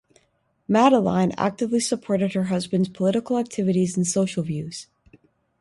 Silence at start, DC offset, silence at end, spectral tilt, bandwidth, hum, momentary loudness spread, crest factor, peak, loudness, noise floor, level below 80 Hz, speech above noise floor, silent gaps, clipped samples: 0.7 s; under 0.1%; 0.75 s; -5.5 dB/octave; 11.5 kHz; none; 11 LU; 18 dB; -4 dBFS; -22 LUFS; -67 dBFS; -60 dBFS; 46 dB; none; under 0.1%